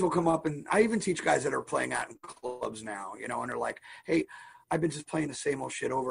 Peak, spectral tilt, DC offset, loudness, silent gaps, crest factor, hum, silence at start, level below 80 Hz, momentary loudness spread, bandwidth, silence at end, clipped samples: -12 dBFS; -5 dB/octave; under 0.1%; -31 LUFS; none; 20 dB; none; 0 s; -64 dBFS; 13 LU; 10.5 kHz; 0 s; under 0.1%